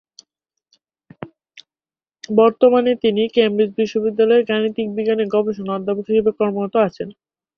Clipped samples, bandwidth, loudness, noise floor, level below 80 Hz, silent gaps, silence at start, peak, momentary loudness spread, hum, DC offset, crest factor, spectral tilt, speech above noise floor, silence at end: under 0.1%; 6.8 kHz; -18 LUFS; under -90 dBFS; -60 dBFS; none; 1.2 s; -2 dBFS; 14 LU; none; under 0.1%; 18 dB; -6.5 dB/octave; over 73 dB; 0.45 s